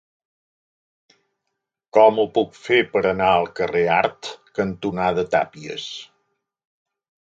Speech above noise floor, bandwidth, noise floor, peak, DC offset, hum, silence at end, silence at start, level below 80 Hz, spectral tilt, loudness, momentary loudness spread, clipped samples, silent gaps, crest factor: 60 dB; 7.8 kHz; -80 dBFS; -2 dBFS; under 0.1%; none; 1.2 s; 1.95 s; -56 dBFS; -5.5 dB/octave; -20 LUFS; 15 LU; under 0.1%; none; 20 dB